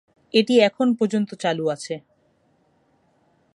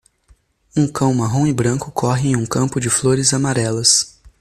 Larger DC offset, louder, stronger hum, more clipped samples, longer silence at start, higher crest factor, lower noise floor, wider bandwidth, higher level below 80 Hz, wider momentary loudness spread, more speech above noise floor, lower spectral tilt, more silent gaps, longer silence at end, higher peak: neither; second, -21 LUFS vs -17 LUFS; neither; neither; second, 0.35 s vs 0.75 s; about the same, 20 dB vs 18 dB; first, -63 dBFS vs -54 dBFS; second, 11 kHz vs 14.5 kHz; second, -76 dBFS vs -48 dBFS; first, 13 LU vs 7 LU; first, 43 dB vs 38 dB; about the same, -5 dB/octave vs -4 dB/octave; neither; first, 1.55 s vs 0.15 s; second, -4 dBFS vs 0 dBFS